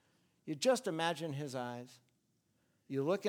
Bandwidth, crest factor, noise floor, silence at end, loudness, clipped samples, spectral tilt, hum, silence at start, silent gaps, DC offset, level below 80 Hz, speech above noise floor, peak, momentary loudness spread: 17 kHz; 20 dB; -78 dBFS; 0 s; -37 LUFS; under 0.1%; -4.5 dB/octave; none; 0.45 s; none; under 0.1%; -88 dBFS; 42 dB; -18 dBFS; 17 LU